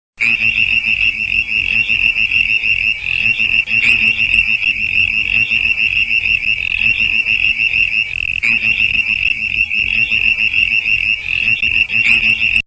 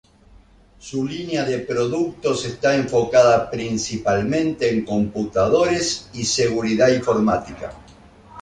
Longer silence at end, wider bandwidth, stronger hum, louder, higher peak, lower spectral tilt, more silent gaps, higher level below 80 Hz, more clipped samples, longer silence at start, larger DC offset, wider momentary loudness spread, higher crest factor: about the same, 0.05 s vs 0 s; second, 8 kHz vs 11 kHz; neither; first, -12 LUFS vs -20 LUFS; about the same, 0 dBFS vs -2 dBFS; second, -2 dB/octave vs -4.5 dB/octave; neither; first, -38 dBFS vs -48 dBFS; neither; second, 0.2 s vs 0.85 s; neither; second, 4 LU vs 8 LU; about the same, 14 dB vs 18 dB